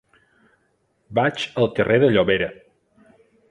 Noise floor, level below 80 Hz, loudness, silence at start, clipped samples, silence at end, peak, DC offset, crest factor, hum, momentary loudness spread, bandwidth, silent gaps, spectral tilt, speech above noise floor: -67 dBFS; -52 dBFS; -20 LUFS; 1.1 s; under 0.1%; 0.95 s; -4 dBFS; under 0.1%; 20 dB; none; 8 LU; 10.5 kHz; none; -6.5 dB/octave; 48 dB